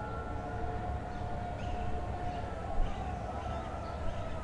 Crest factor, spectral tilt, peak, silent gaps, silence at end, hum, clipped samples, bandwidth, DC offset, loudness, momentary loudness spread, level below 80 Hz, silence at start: 16 dB; -7 dB/octave; -20 dBFS; none; 0 s; none; under 0.1%; 10.5 kHz; under 0.1%; -39 LUFS; 2 LU; -40 dBFS; 0 s